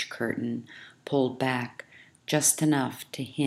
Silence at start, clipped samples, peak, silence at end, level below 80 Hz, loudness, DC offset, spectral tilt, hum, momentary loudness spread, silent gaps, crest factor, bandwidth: 0 s; under 0.1%; -8 dBFS; 0 s; -76 dBFS; -27 LUFS; under 0.1%; -4 dB/octave; none; 21 LU; none; 20 dB; 16 kHz